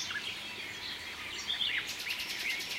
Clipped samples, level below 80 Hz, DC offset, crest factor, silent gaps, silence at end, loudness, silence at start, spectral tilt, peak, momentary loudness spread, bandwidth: under 0.1%; -66 dBFS; under 0.1%; 18 dB; none; 0 s; -35 LUFS; 0 s; 0 dB/octave; -20 dBFS; 8 LU; 16 kHz